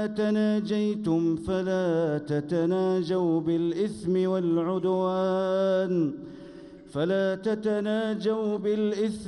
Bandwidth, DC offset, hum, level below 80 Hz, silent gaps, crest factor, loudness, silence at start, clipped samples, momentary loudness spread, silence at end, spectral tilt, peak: 11 kHz; under 0.1%; none; -60 dBFS; none; 12 dB; -26 LUFS; 0 s; under 0.1%; 4 LU; 0 s; -7.5 dB/octave; -16 dBFS